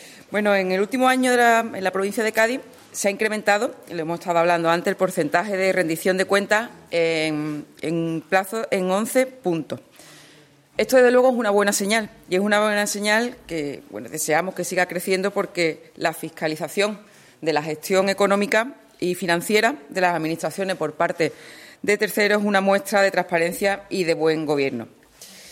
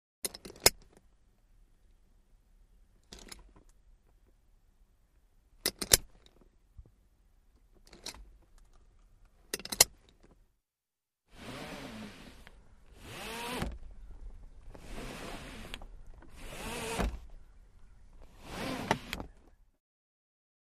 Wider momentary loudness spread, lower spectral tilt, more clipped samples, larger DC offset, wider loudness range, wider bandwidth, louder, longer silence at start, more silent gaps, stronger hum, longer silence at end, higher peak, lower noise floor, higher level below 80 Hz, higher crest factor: second, 10 LU vs 28 LU; first, -4 dB/octave vs -1.5 dB/octave; neither; neither; second, 4 LU vs 13 LU; about the same, 16.5 kHz vs 15 kHz; first, -21 LUFS vs -33 LUFS; second, 0 s vs 0.25 s; neither; neither; second, 0 s vs 1.25 s; about the same, -4 dBFS vs -2 dBFS; second, -52 dBFS vs under -90 dBFS; second, -66 dBFS vs -50 dBFS; second, 16 dB vs 38 dB